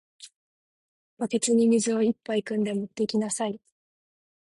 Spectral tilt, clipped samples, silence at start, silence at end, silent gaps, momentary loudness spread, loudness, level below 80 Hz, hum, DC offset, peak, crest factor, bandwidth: -4.5 dB/octave; under 0.1%; 0.2 s; 0.95 s; 0.36-1.17 s; 10 LU; -26 LUFS; -72 dBFS; none; under 0.1%; -12 dBFS; 16 dB; 11.5 kHz